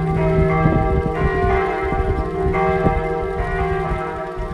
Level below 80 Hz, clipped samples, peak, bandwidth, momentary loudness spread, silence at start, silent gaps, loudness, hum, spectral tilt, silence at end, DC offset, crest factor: -26 dBFS; under 0.1%; -2 dBFS; 10 kHz; 6 LU; 0 s; none; -19 LUFS; none; -8.5 dB/octave; 0 s; under 0.1%; 16 dB